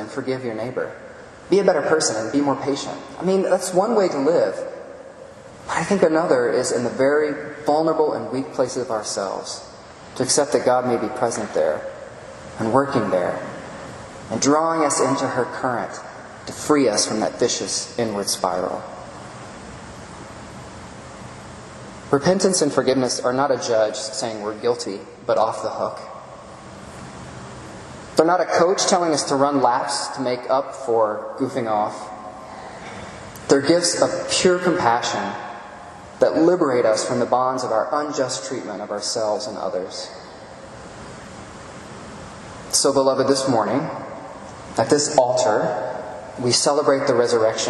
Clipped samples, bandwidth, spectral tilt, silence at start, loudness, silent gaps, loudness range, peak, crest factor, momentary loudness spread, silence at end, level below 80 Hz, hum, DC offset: under 0.1%; 12 kHz; -3.5 dB/octave; 0 s; -20 LUFS; none; 7 LU; 0 dBFS; 22 dB; 20 LU; 0 s; -56 dBFS; none; under 0.1%